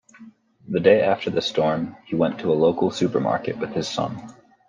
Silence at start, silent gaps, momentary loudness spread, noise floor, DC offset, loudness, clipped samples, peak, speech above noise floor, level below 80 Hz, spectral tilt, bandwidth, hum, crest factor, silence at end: 0.2 s; none; 10 LU; -48 dBFS; under 0.1%; -22 LUFS; under 0.1%; -4 dBFS; 27 dB; -62 dBFS; -6 dB/octave; 9.6 kHz; none; 20 dB; 0.4 s